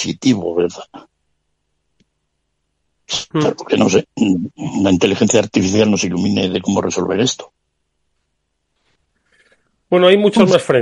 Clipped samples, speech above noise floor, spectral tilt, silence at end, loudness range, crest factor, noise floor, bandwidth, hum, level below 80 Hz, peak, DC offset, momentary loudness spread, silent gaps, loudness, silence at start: under 0.1%; 56 dB; -5 dB/octave; 0 s; 8 LU; 16 dB; -70 dBFS; 11.5 kHz; none; -54 dBFS; 0 dBFS; under 0.1%; 9 LU; none; -15 LUFS; 0 s